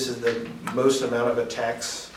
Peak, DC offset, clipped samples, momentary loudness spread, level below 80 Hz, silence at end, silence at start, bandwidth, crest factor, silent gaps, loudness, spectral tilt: -8 dBFS; under 0.1%; under 0.1%; 8 LU; -60 dBFS; 0 s; 0 s; 16 kHz; 18 dB; none; -25 LUFS; -3.5 dB/octave